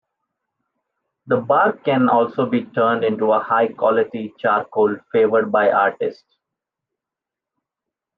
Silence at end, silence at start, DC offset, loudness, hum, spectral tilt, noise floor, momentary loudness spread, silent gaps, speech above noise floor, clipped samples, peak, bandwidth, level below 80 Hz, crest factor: 2.05 s; 1.25 s; under 0.1%; -18 LUFS; none; -9 dB/octave; -86 dBFS; 6 LU; none; 68 dB; under 0.1%; -4 dBFS; 5.2 kHz; -72 dBFS; 16 dB